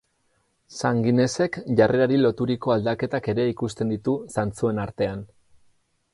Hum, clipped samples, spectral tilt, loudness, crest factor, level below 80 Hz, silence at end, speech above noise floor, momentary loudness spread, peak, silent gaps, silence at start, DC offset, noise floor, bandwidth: none; under 0.1%; -6.5 dB/octave; -23 LUFS; 18 dB; -54 dBFS; 0.9 s; 46 dB; 8 LU; -6 dBFS; none; 0.7 s; under 0.1%; -69 dBFS; 11.5 kHz